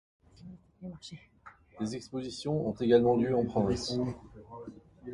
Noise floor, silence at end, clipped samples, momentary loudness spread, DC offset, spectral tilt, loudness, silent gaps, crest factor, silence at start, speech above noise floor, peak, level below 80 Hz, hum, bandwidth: -52 dBFS; 0 s; under 0.1%; 24 LU; under 0.1%; -6.5 dB/octave; -30 LUFS; none; 20 dB; 0.45 s; 22 dB; -12 dBFS; -56 dBFS; none; 11.5 kHz